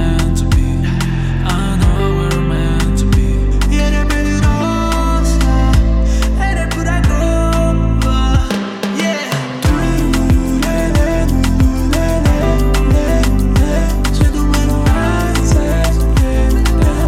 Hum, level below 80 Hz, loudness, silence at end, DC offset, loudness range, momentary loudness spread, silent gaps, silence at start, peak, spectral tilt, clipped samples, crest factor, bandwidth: none; -14 dBFS; -14 LUFS; 0 s; under 0.1%; 1 LU; 3 LU; none; 0 s; -2 dBFS; -6 dB/octave; under 0.1%; 10 dB; 15 kHz